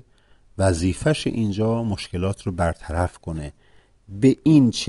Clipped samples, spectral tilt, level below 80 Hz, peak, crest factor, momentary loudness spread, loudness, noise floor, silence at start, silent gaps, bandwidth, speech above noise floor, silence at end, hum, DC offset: under 0.1%; -6.5 dB/octave; -40 dBFS; -4 dBFS; 18 dB; 16 LU; -22 LUFS; -55 dBFS; 0.55 s; none; 11.5 kHz; 34 dB; 0 s; none; under 0.1%